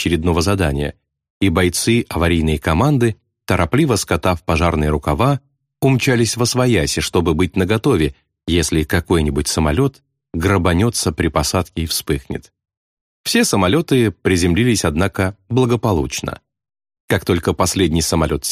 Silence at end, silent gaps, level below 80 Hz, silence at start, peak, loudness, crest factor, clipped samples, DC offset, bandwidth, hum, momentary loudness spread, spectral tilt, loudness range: 0 s; 1.30-1.41 s, 12.77-13.24 s, 17.00-17.08 s; -32 dBFS; 0 s; -2 dBFS; -17 LUFS; 14 dB; under 0.1%; under 0.1%; 15.5 kHz; none; 7 LU; -5 dB/octave; 2 LU